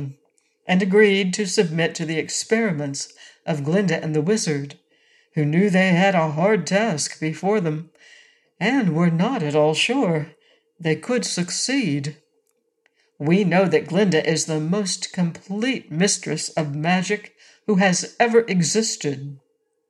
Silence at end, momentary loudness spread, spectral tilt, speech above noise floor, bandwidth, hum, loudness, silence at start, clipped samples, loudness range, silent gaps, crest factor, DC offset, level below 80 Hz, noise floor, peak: 0.55 s; 11 LU; -4.5 dB/octave; 48 dB; 12 kHz; none; -21 LUFS; 0 s; under 0.1%; 3 LU; none; 18 dB; under 0.1%; -72 dBFS; -69 dBFS; -4 dBFS